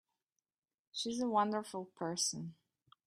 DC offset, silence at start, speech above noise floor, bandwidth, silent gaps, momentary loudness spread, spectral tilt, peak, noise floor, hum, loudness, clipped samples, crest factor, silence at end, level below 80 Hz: under 0.1%; 0.95 s; 52 dB; 14 kHz; none; 13 LU; -3 dB/octave; -20 dBFS; -89 dBFS; none; -37 LUFS; under 0.1%; 20 dB; 0.55 s; -82 dBFS